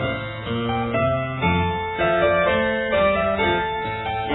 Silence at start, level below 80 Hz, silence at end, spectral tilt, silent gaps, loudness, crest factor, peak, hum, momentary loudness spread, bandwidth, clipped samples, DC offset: 0 s; -42 dBFS; 0 s; -9.5 dB/octave; none; -21 LUFS; 14 dB; -8 dBFS; none; 7 LU; 4.1 kHz; under 0.1%; under 0.1%